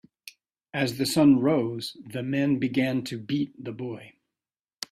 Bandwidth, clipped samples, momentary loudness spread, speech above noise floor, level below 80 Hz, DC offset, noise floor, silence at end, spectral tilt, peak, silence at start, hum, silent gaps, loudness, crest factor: 15 kHz; under 0.1%; 16 LU; over 65 dB; -66 dBFS; under 0.1%; under -90 dBFS; 0.8 s; -5.5 dB/octave; -8 dBFS; 0.25 s; none; none; -26 LUFS; 18 dB